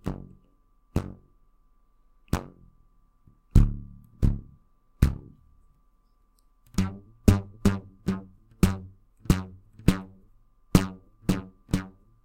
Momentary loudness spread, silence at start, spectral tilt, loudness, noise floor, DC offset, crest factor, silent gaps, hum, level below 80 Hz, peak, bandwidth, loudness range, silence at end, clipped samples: 19 LU; 0.05 s; -7 dB/octave; -28 LUFS; -63 dBFS; under 0.1%; 28 dB; none; none; -34 dBFS; 0 dBFS; 16.5 kHz; 4 LU; 0.35 s; under 0.1%